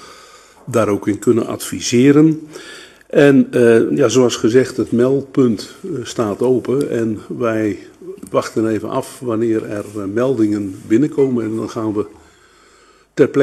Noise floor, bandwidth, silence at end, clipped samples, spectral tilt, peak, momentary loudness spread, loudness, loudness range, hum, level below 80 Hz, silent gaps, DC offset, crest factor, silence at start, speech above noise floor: -50 dBFS; 13.5 kHz; 0 s; under 0.1%; -6 dB/octave; 0 dBFS; 13 LU; -16 LUFS; 6 LU; none; -56 dBFS; none; under 0.1%; 16 dB; 0 s; 34 dB